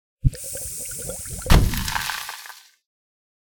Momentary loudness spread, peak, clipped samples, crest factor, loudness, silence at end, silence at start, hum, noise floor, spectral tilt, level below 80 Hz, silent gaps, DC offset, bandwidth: 16 LU; 0 dBFS; under 0.1%; 24 dB; -24 LUFS; 0.9 s; 0.25 s; none; -43 dBFS; -4 dB/octave; -26 dBFS; none; under 0.1%; over 20 kHz